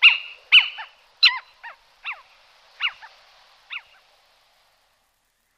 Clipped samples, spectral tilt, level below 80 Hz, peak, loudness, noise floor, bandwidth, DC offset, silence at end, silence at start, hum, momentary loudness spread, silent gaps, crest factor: under 0.1%; 4.5 dB/octave; -72 dBFS; -4 dBFS; -17 LUFS; -69 dBFS; 14.5 kHz; under 0.1%; 1.8 s; 0 s; none; 27 LU; none; 22 dB